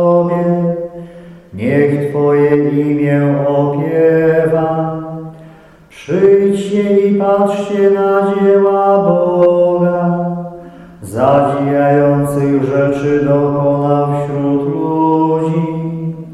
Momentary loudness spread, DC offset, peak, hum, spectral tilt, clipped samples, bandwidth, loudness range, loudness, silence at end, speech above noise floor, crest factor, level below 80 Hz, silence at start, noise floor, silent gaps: 12 LU; under 0.1%; -2 dBFS; none; -8.5 dB/octave; under 0.1%; 12.5 kHz; 3 LU; -13 LUFS; 0 s; 29 dB; 12 dB; -48 dBFS; 0 s; -40 dBFS; none